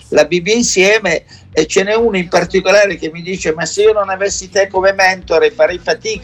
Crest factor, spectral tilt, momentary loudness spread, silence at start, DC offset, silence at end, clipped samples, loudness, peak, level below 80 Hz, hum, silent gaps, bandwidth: 14 dB; -3 dB/octave; 8 LU; 0.1 s; under 0.1%; 0 s; under 0.1%; -13 LUFS; 0 dBFS; -42 dBFS; none; none; 13 kHz